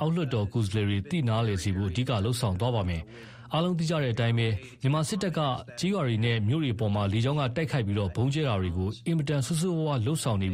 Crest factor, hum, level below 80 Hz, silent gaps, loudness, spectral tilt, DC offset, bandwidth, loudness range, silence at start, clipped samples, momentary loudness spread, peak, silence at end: 14 dB; none; -50 dBFS; none; -28 LUFS; -6 dB/octave; under 0.1%; 14.5 kHz; 1 LU; 0 s; under 0.1%; 4 LU; -14 dBFS; 0 s